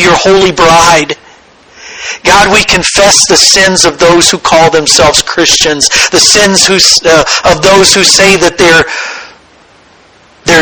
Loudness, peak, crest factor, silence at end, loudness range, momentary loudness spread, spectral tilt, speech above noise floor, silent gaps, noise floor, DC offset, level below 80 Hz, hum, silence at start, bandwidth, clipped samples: -4 LUFS; 0 dBFS; 6 dB; 0 s; 2 LU; 10 LU; -1.5 dB/octave; 35 dB; none; -40 dBFS; 0.6%; -32 dBFS; none; 0 s; over 20 kHz; 5%